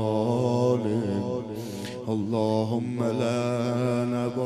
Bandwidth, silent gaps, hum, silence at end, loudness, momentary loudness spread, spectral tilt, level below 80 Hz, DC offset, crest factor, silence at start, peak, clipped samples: 13.5 kHz; none; none; 0 s; -27 LUFS; 8 LU; -7.5 dB/octave; -64 dBFS; under 0.1%; 16 dB; 0 s; -10 dBFS; under 0.1%